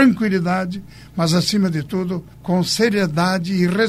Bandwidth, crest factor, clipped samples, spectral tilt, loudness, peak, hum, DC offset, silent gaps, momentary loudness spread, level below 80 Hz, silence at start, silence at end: 15 kHz; 16 dB; under 0.1%; -5.5 dB/octave; -19 LUFS; -2 dBFS; none; under 0.1%; none; 10 LU; -48 dBFS; 0 s; 0 s